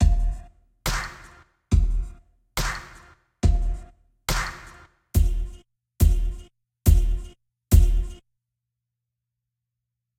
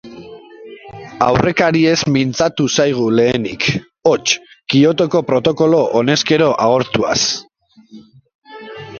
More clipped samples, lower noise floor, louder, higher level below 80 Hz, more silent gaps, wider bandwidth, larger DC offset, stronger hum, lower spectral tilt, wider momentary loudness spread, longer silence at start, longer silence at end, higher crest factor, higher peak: neither; first, -84 dBFS vs -42 dBFS; second, -25 LUFS vs -14 LUFS; first, -24 dBFS vs -48 dBFS; second, none vs 8.35-8.42 s; first, 16 kHz vs 7.4 kHz; neither; neither; about the same, -5 dB/octave vs -4.5 dB/octave; about the same, 18 LU vs 18 LU; about the same, 0 s vs 0.05 s; first, 2.05 s vs 0 s; about the same, 20 dB vs 16 dB; second, -4 dBFS vs 0 dBFS